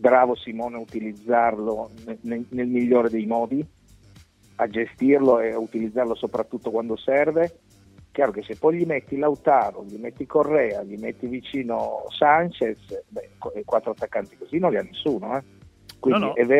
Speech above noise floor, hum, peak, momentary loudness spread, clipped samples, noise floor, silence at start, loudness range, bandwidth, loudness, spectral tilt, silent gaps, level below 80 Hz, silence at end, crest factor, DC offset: 29 dB; none; -4 dBFS; 14 LU; under 0.1%; -52 dBFS; 0 s; 3 LU; 11.5 kHz; -23 LUFS; -7 dB/octave; none; -58 dBFS; 0 s; 20 dB; under 0.1%